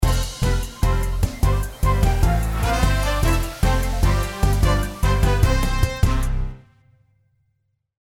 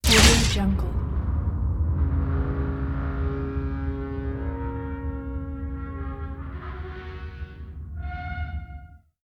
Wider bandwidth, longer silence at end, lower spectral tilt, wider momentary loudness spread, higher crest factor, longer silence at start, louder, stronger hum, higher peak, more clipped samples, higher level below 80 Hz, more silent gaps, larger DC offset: about the same, 16.5 kHz vs 16.5 kHz; first, 1.5 s vs 0.25 s; first, -5.5 dB/octave vs -4 dB/octave; second, 4 LU vs 14 LU; second, 16 dB vs 22 dB; about the same, 0 s vs 0.05 s; first, -21 LUFS vs -26 LUFS; neither; about the same, -4 dBFS vs -4 dBFS; neither; first, -22 dBFS vs -28 dBFS; neither; neither